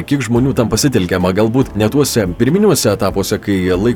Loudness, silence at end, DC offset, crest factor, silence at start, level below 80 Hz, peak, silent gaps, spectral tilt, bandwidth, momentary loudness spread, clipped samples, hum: -14 LUFS; 0 s; under 0.1%; 12 dB; 0 s; -34 dBFS; -2 dBFS; none; -5.5 dB/octave; 18.5 kHz; 4 LU; under 0.1%; none